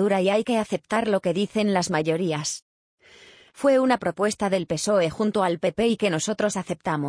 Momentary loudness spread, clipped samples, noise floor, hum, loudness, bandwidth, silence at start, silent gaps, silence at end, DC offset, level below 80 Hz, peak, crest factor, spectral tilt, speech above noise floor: 5 LU; under 0.1%; -51 dBFS; none; -24 LUFS; 10.5 kHz; 0 s; 2.62-2.98 s; 0 s; under 0.1%; -60 dBFS; -8 dBFS; 16 dB; -4.5 dB/octave; 28 dB